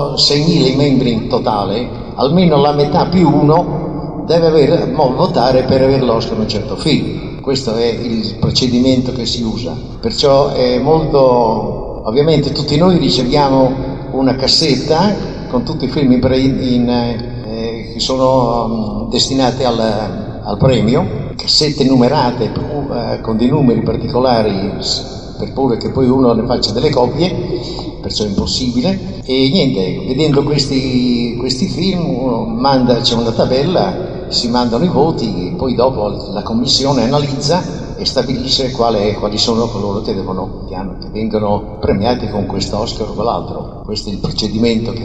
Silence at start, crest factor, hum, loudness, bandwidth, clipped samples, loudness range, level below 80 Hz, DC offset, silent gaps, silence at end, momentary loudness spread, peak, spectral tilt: 0 s; 14 dB; none; -14 LUFS; 9.6 kHz; under 0.1%; 4 LU; -32 dBFS; 1%; none; 0 s; 10 LU; 0 dBFS; -6 dB/octave